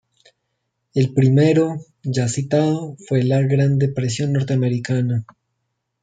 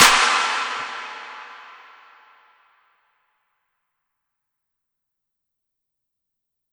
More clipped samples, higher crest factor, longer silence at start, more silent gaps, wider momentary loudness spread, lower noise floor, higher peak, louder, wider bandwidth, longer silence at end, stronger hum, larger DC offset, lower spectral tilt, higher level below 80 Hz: neither; second, 16 dB vs 26 dB; first, 0.95 s vs 0 s; neither; second, 9 LU vs 25 LU; second, -75 dBFS vs -81 dBFS; second, -4 dBFS vs 0 dBFS; about the same, -19 LUFS vs -19 LUFS; second, 9.2 kHz vs over 20 kHz; second, 0.8 s vs 5.05 s; neither; neither; first, -7 dB/octave vs 1.5 dB/octave; about the same, -56 dBFS vs -54 dBFS